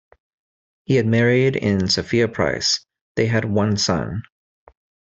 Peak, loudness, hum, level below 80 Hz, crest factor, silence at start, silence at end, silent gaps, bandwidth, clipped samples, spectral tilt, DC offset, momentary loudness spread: -4 dBFS; -19 LUFS; none; -52 dBFS; 16 dB; 0.9 s; 0.9 s; 3.01-3.15 s; 8 kHz; under 0.1%; -5 dB/octave; under 0.1%; 7 LU